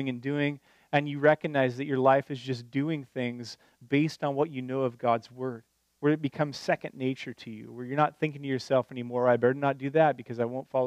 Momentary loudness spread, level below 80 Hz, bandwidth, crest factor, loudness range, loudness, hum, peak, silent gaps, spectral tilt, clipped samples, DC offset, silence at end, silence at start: 13 LU; -76 dBFS; 11 kHz; 20 dB; 3 LU; -29 LUFS; none; -8 dBFS; none; -7 dB/octave; under 0.1%; under 0.1%; 0 s; 0 s